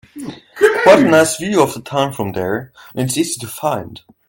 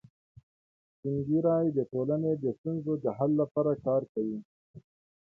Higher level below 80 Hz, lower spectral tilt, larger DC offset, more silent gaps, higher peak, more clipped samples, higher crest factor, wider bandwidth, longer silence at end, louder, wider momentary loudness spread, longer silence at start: first, -54 dBFS vs -68 dBFS; second, -4.5 dB/octave vs -13 dB/octave; neither; second, none vs 2.58-2.64 s, 3.51-3.55 s, 4.09-4.15 s, 4.45-4.74 s; first, 0 dBFS vs -14 dBFS; neither; about the same, 16 dB vs 16 dB; first, 17 kHz vs 2.3 kHz; second, 0.3 s vs 0.45 s; first, -15 LUFS vs -30 LUFS; first, 21 LU vs 8 LU; second, 0.15 s vs 1.05 s